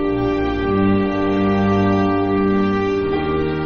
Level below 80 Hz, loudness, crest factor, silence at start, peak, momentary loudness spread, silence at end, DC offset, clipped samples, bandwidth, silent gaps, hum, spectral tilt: -36 dBFS; -18 LUFS; 12 dB; 0 s; -6 dBFS; 3 LU; 0 s; under 0.1%; under 0.1%; 6.6 kHz; none; none; -6.5 dB/octave